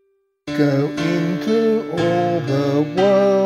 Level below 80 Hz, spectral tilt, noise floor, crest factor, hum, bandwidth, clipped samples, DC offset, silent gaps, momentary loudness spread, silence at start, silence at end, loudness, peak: -56 dBFS; -7 dB/octave; -37 dBFS; 14 dB; none; 13.5 kHz; under 0.1%; under 0.1%; none; 5 LU; 0.45 s; 0 s; -18 LUFS; -4 dBFS